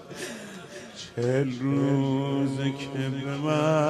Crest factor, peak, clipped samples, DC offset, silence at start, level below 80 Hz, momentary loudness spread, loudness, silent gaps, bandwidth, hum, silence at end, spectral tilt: 14 dB; -12 dBFS; under 0.1%; under 0.1%; 0 s; -66 dBFS; 15 LU; -27 LUFS; none; 12.5 kHz; none; 0 s; -6.5 dB/octave